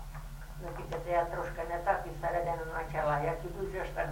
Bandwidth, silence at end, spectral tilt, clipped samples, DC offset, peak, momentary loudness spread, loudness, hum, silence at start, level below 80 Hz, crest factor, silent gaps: 16.5 kHz; 0 s; -6.5 dB/octave; under 0.1%; under 0.1%; -16 dBFS; 12 LU; -35 LUFS; none; 0 s; -44 dBFS; 18 dB; none